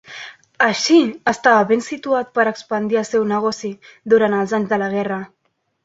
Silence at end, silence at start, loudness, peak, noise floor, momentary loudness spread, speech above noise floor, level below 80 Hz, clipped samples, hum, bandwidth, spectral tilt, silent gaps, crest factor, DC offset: 0.6 s; 0.1 s; -18 LUFS; -2 dBFS; -37 dBFS; 16 LU; 20 dB; -62 dBFS; under 0.1%; none; 8 kHz; -4.5 dB/octave; none; 16 dB; under 0.1%